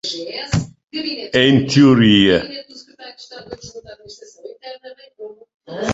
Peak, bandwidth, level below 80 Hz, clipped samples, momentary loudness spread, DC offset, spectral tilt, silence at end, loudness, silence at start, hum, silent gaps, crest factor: -2 dBFS; 8 kHz; -44 dBFS; under 0.1%; 26 LU; under 0.1%; -5.5 dB/octave; 0 s; -15 LUFS; 0.05 s; none; 5.54-5.60 s; 16 dB